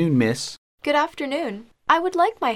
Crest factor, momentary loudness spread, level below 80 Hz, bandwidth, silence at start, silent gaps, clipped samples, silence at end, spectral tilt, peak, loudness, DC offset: 18 dB; 11 LU; -62 dBFS; 15.5 kHz; 0 s; 0.58-0.78 s; under 0.1%; 0 s; -5.5 dB/octave; -4 dBFS; -23 LUFS; under 0.1%